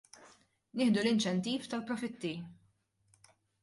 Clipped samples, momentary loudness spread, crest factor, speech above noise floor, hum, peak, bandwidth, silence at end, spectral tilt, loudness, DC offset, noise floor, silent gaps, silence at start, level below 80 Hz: under 0.1%; 15 LU; 18 dB; 40 dB; none; -18 dBFS; 11.5 kHz; 1.1 s; -5 dB/octave; -34 LUFS; under 0.1%; -73 dBFS; none; 0.2 s; -76 dBFS